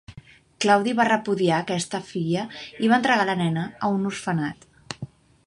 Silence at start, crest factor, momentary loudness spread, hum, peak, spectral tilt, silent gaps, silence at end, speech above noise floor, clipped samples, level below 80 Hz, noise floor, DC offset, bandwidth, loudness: 0.1 s; 20 dB; 16 LU; none; -4 dBFS; -5 dB/octave; none; 0.4 s; 25 dB; under 0.1%; -62 dBFS; -48 dBFS; under 0.1%; 11.5 kHz; -23 LUFS